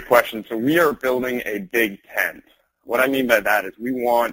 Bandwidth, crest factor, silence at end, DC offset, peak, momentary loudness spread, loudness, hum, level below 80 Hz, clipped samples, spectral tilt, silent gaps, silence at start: 17 kHz; 20 dB; 0 s; under 0.1%; 0 dBFS; 8 LU; -20 LUFS; none; -56 dBFS; under 0.1%; -4.5 dB/octave; none; 0 s